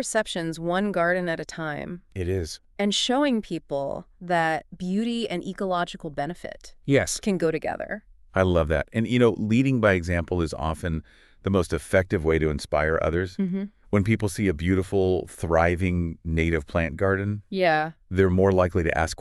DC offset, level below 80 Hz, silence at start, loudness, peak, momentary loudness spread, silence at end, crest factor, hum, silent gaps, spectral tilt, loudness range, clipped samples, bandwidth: under 0.1%; -42 dBFS; 0 s; -25 LUFS; -4 dBFS; 10 LU; 0.05 s; 20 dB; none; none; -5.5 dB/octave; 3 LU; under 0.1%; 13 kHz